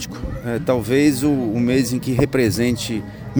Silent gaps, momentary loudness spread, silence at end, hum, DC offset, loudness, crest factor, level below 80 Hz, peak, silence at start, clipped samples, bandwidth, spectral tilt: none; 9 LU; 0 s; none; under 0.1%; -19 LUFS; 16 dB; -38 dBFS; -2 dBFS; 0 s; under 0.1%; over 20 kHz; -6 dB/octave